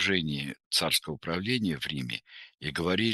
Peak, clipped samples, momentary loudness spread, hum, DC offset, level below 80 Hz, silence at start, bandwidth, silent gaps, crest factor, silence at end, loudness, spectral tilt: -10 dBFS; under 0.1%; 11 LU; none; under 0.1%; -58 dBFS; 0 s; 12.5 kHz; 0.66-0.71 s; 20 dB; 0 s; -30 LUFS; -3.5 dB/octave